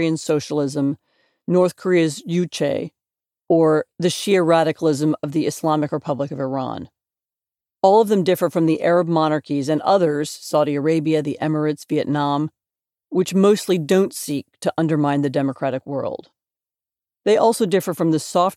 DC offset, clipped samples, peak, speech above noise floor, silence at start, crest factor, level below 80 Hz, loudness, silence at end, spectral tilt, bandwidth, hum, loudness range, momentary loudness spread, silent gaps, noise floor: under 0.1%; under 0.1%; -2 dBFS; over 71 dB; 0 s; 18 dB; -68 dBFS; -20 LUFS; 0 s; -6 dB/octave; 16 kHz; none; 3 LU; 9 LU; none; under -90 dBFS